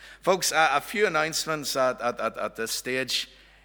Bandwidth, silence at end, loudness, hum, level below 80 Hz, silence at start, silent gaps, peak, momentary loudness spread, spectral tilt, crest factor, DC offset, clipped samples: over 20 kHz; 0.4 s; -26 LUFS; none; -60 dBFS; 0 s; none; -6 dBFS; 8 LU; -2 dB/octave; 20 dB; under 0.1%; under 0.1%